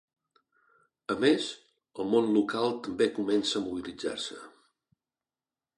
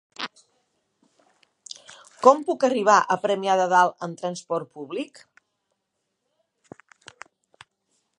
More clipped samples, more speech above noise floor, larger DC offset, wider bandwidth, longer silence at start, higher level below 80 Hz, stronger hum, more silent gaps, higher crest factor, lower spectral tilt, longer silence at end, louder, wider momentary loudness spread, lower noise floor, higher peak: neither; first, over 61 dB vs 57 dB; neither; about the same, 11.5 kHz vs 11.5 kHz; first, 1.1 s vs 0.2 s; first, -70 dBFS vs -80 dBFS; neither; neither; about the same, 20 dB vs 24 dB; about the same, -4.5 dB/octave vs -4 dB/octave; second, 1.3 s vs 3.1 s; second, -29 LUFS vs -22 LUFS; second, 15 LU vs 20 LU; first, under -90 dBFS vs -78 dBFS; second, -10 dBFS vs -2 dBFS